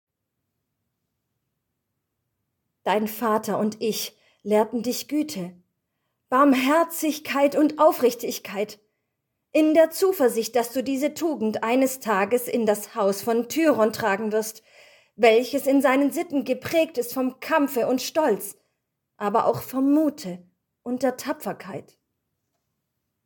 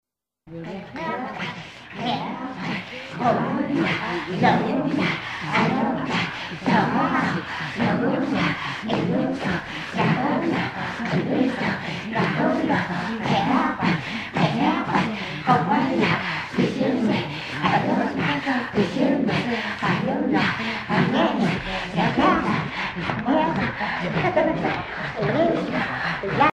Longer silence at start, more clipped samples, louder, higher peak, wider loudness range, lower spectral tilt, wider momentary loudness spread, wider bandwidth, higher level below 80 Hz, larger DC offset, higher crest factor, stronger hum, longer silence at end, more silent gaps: first, 2.85 s vs 0.45 s; neither; about the same, -23 LUFS vs -23 LUFS; about the same, -2 dBFS vs -4 dBFS; first, 6 LU vs 2 LU; second, -4.5 dB/octave vs -6.5 dB/octave; first, 12 LU vs 8 LU; first, 17.5 kHz vs 10.5 kHz; second, -72 dBFS vs -52 dBFS; neither; about the same, 22 dB vs 20 dB; neither; first, 1.45 s vs 0.05 s; neither